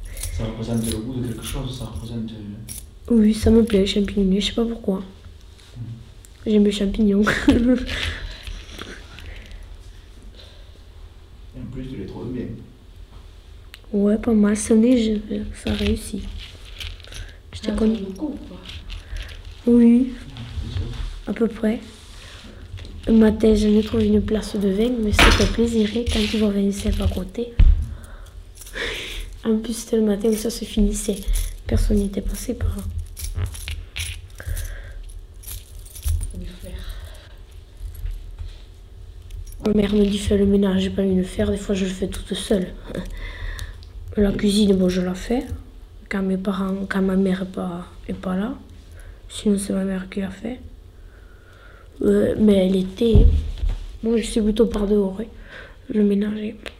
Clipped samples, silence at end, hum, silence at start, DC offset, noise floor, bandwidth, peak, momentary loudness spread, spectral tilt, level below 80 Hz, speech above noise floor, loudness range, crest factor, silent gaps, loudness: under 0.1%; 0.1 s; none; 0 s; under 0.1%; -44 dBFS; 16 kHz; -2 dBFS; 21 LU; -6 dB/octave; -30 dBFS; 25 dB; 14 LU; 20 dB; none; -21 LUFS